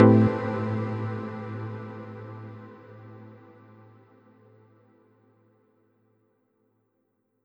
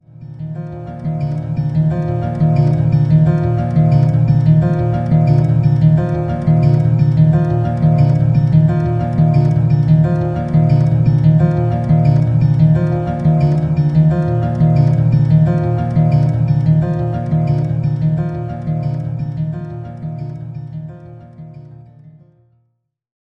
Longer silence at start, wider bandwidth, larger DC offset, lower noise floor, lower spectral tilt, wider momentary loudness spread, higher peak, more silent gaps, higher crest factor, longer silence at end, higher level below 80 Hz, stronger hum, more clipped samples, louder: second, 0 s vs 0.2 s; about the same, 5.4 kHz vs 5.4 kHz; neither; first, -74 dBFS vs -66 dBFS; about the same, -10.5 dB/octave vs -11 dB/octave; first, 24 LU vs 12 LU; second, -4 dBFS vs 0 dBFS; neither; first, 26 dB vs 14 dB; first, 4.1 s vs 1.15 s; second, -64 dBFS vs -34 dBFS; neither; neither; second, -28 LUFS vs -14 LUFS